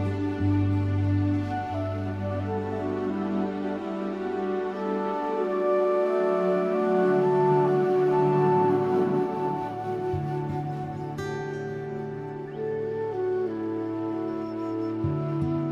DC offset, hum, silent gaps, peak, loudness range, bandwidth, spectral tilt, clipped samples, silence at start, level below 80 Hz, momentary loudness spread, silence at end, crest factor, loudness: under 0.1%; none; none; -12 dBFS; 8 LU; 7.2 kHz; -9 dB/octave; under 0.1%; 0 s; -56 dBFS; 10 LU; 0 s; 14 dB; -27 LUFS